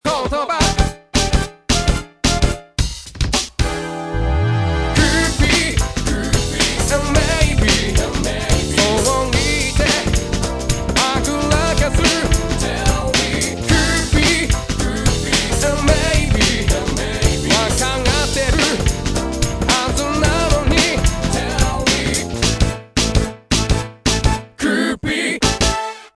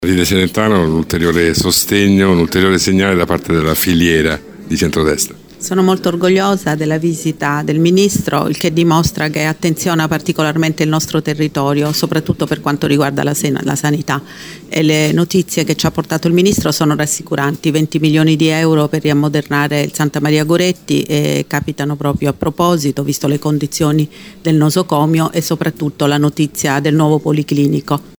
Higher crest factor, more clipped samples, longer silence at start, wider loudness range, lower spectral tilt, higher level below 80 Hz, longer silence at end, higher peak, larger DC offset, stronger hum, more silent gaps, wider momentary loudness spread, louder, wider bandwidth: about the same, 16 dB vs 12 dB; neither; about the same, 0.05 s vs 0 s; about the same, 2 LU vs 3 LU; about the same, -4 dB/octave vs -5 dB/octave; first, -22 dBFS vs -40 dBFS; about the same, 0.1 s vs 0.1 s; about the same, 0 dBFS vs 0 dBFS; neither; neither; neither; about the same, 6 LU vs 6 LU; second, -17 LUFS vs -14 LUFS; second, 11 kHz vs over 20 kHz